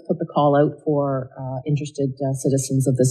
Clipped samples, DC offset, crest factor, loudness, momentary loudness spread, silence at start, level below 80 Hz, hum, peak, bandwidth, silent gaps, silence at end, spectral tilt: under 0.1%; under 0.1%; 16 dB; -21 LUFS; 9 LU; 0.1 s; -60 dBFS; none; -6 dBFS; 12.5 kHz; none; 0 s; -7 dB/octave